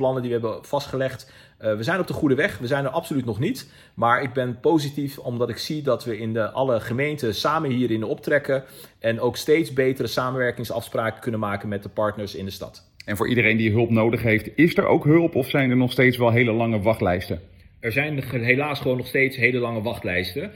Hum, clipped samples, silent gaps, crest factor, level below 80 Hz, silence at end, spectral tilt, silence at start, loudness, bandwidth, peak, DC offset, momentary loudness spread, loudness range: none; under 0.1%; none; 20 dB; -56 dBFS; 0 s; -6.5 dB/octave; 0 s; -23 LUFS; 17.5 kHz; -2 dBFS; under 0.1%; 10 LU; 5 LU